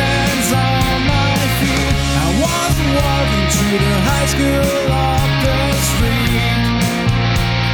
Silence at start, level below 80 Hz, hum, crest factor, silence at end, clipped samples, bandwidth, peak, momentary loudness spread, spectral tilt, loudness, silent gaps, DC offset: 0 s; -22 dBFS; none; 12 dB; 0 s; under 0.1%; over 20 kHz; -4 dBFS; 1 LU; -4.5 dB/octave; -15 LUFS; none; under 0.1%